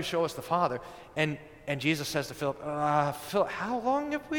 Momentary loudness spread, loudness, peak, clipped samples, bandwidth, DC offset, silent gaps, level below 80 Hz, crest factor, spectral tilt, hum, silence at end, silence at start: 6 LU; -31 LUFS; -12 dBFS; under 0.1%; 19 kHz; under 0.1%; none; -60 dBFS; 18 dB; -5 dB/octave; none; 0 s; 0 s